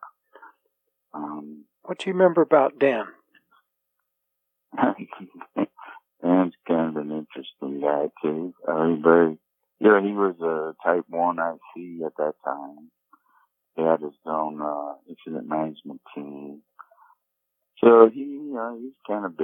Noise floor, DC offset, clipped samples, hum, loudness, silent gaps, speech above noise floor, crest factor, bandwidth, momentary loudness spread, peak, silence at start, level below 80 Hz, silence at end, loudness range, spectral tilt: -80 dBFS; under 0.1%; under 0.1%; none; -23 LUFS; none; 57 dB; 24 dB; 8.6 kHz; 20 LU; 0 dBFS; 0 s; -78 dBFS; 0 s; 8 LU; -8 dB/octave